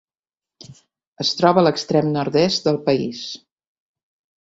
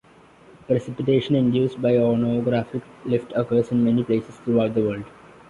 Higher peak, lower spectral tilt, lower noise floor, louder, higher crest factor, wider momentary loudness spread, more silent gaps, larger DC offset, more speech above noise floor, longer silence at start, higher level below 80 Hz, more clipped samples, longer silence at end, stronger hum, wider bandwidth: first, -2 dBFS vs -8 dBFS; second, -5.5 dB/octave vs -8.5 dB/octave; first, under -90 dBFS vs -50 dBFS; first, -19 LUFS vs -22 LUFS; first, 20 dB vs 14 dB; first, 14 LU vs 7 LU; first, 1.07-1.13 s vs none; neither; first, over 72 dB vs 29 dB; about the same, 0.7 s vs 0.7 s; about the same, -60 dBFS vs -56 dBFS; neither; first, 1.05 s vs 0.4 s; neither; first, 8 kHz vs 7.2 kHz